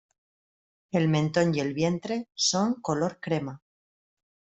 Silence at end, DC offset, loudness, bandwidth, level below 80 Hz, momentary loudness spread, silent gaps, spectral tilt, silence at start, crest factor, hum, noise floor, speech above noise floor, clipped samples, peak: 0.95 s; under 0.1%; -27 LUFS; 8.2 kHz; -64 dBFS; 7 LU; none; -5 dB/octave; 0.95 s; 18 dB; none; under -90 dBFS; over 64 dB; under 0.1%; -10 dBFS